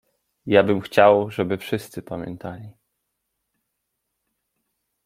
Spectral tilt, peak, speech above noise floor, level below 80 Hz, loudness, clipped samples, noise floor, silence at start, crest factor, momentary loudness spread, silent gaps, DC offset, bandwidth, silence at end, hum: -6.5 dB/octave; -2 dBFS; 58 dB; -62 dBFS; -19 LUFS; under 0.1%; -78 dBFS; 0.45 s; 22 dB; 20 LU; none; under 0.1%; 16 kHz; 2.35 s; none